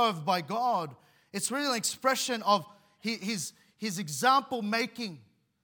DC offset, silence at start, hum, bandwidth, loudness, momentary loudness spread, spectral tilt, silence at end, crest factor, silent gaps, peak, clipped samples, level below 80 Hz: under 0.1%; 0 s; none; 18 kHz; -30 LUFS; 13 LU; -3 dB/octave; 0.45 s; 20 dB; none; -10 dBFS; under 0.1%; -82 dBFS